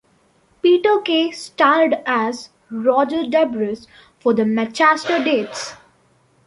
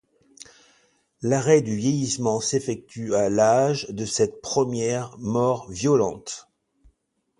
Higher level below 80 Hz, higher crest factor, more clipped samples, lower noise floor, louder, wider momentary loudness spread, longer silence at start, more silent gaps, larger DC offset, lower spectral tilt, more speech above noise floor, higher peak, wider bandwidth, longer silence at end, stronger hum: second, -64 dBFS vs -58 dBFS; about the same, 16 dB vs 20 dB; neither; second, -58 dBFS vs -71 dBFS; first, -18 LUFS vs -23 LUFS; about the same, 13 LU vs 11 LU; second, 0.65 s vs 1.2 s; neither; neither; about the same, -4 dB/octave vs -5 dB/octave; second, 40 dB vs 48 dB; about the same, -2 dBFS vs -4 dBFS; about the same, 11.5 kHz vs 11.5 kHz; second, 0.7 s vs 1 s; neither